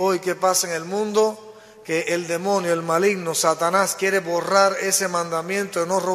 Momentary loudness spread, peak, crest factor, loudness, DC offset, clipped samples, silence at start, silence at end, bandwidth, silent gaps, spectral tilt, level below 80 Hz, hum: 6 LU; -4 dBFS; 18 dB; -21 LUFS; under 0.1%; under 0.1%; 0 s; 0 s; 14.5 kHz; none; -3 dB/octave; -68 dBFS; none